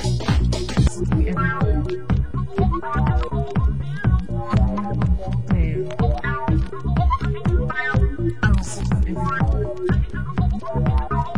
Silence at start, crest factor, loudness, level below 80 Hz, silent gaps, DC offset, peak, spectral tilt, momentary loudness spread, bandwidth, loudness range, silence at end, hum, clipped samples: 0 s; 16 dB; -22 LUFS; -24 dBFS; none; 3%; -4 dBFS; -7 dB/octave; 3 LU; 11 kHz; 1 LU; 0 s; none; under 0.1%